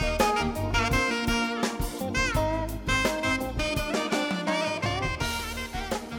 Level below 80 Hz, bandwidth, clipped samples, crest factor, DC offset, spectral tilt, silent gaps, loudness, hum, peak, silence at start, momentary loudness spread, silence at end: -36 dBFS; over 20 kHz; under 0.1%; 18 dB; under 0.1%; -4 dB/octave; none; -27 LUFS; none; -10 dBFS; 0 s; 6 LU; 0 s